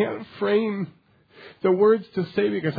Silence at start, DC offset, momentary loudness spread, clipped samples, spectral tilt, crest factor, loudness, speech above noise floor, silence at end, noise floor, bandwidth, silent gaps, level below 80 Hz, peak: 0 s; under 0.1%; 10 LU; under 0.1%; -9.5 dB/octave; 16 dB; -23 LUFS; 27 dB; 0 s; -49 dBFS; 5 kHz; none; -70 dBFS; -8 dBFS